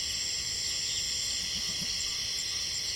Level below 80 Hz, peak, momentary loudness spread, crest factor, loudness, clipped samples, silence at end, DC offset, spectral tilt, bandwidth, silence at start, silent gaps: -54 dBFS; -18 dBFS; 1 LU; 14 dB; -30 LUFS; under 0.1%; 0 s; under 0.1%; 0.5 dB/octave; 16.5 kHz; 0 s; none